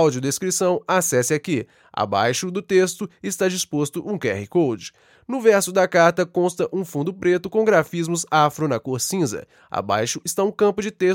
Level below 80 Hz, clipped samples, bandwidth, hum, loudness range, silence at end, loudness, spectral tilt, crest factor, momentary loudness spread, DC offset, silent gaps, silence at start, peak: -64 dBFS; under 0.1%; 17 kHz; none; 3 LU; 0 s; -21 LUFS; -4.5 dB/octave; 20 dB; 9 LU; under 0.1%; none; 0 s; -2 dBFS